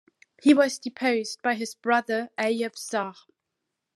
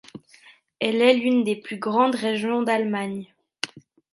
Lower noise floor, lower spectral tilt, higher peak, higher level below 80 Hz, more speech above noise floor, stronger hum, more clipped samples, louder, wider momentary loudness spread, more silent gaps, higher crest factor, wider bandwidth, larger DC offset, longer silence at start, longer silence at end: first, -83 dBFS vs -53 dBFS; second, -3.5 dB/octave vs -5 dB/octave; about the same, -6 dBFS vs -4 dBFS; second, -88 dBFS vs -74 dBFS; first, 58 dB vs 32 dB; neither; neither; about the same, -25 LUFS vs -23 LUFS; second, 10 LU vs 14 LU; neither; about the same, 20 dB vs 20 dB; first, 13 kHz vs 11.5 kHz; neither; first, 0.45 s vs 0.15 s; first, 0.85 s vs 0.35 s